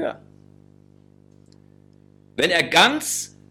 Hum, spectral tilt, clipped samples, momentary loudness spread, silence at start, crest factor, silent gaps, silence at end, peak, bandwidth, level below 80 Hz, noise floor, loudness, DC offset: 50 Hz at -55 dBFS; -2 dB/octave; under 0.1%; 19 LU; 0 s; 20 dB; none; 0.25 s; -4 dBFS; 16.5 kHz; -64 dBFS; -52 dBFS; -19 LUFS; under 0.1%